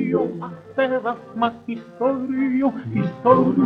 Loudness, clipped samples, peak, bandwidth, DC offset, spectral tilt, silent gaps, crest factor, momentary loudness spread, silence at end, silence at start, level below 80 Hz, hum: -22 LUFS; under 0.1%; -2 dBFS; 5.2 kHz; under 0.1%; -9.5 dB/octave; none; 20 dB; 12 LU; 0 s; 0 s; -58 dBFS; none